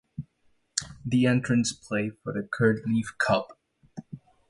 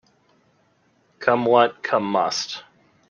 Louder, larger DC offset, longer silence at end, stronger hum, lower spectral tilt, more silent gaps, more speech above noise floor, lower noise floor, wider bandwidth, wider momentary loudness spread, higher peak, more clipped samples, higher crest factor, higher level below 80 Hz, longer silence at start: second, -27 LUFS vs -21 LUFS; neither; second, 0.3 s vs 0.5 s; neither; about the same, -5 dB/octave vs -4 dB/octave; neither; about the same, 42 dB vs 43 dB; first, -67 dBFS vs -63 dBFS; first, 11.5 kHz vs 10 kHz; first, 21 LU vs 11 LU; about the same, -4 dBFS vs -2 dBFS; neither; about the same, 24 dB vs 22 dB; first, -58 dBFS vs -70 dBFS; second, 0.2 s vs 1.2 s